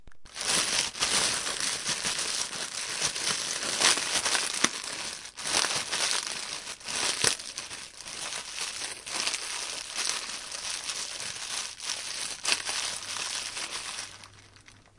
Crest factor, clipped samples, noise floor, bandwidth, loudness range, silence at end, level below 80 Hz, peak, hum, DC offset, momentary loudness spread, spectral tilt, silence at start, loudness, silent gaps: 30 dB; under 0.1%; -55 dBFS; 11.5 kHz; 5 LU; 0.15 s; -62 dBFS; -2 dBFS; none; under 0.1%; 10 LU; 0.5 dB/octave; 0 s; -29 LUFS; none